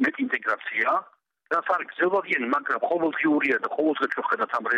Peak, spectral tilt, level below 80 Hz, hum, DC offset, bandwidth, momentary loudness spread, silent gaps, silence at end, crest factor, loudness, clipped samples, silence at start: -10 dBFS; -5.5 dB/octave; -74 dBFS; none; under 0.1%; 8.4 kHz; 4 LU; none; 0 s; 14 dB; -25 LUFS; under 0.1%; 0 s